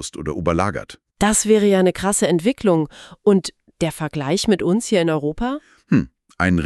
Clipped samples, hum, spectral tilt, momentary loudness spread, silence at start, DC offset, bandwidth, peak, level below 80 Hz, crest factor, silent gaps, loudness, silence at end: under 0.1%; none; -5 dB/octave; 11 LU; 0 s; under 0.1%; 13.5 kHz; -2 dBFS; -44 dBFS; 16 dB; none; -19 LUFS; 0 s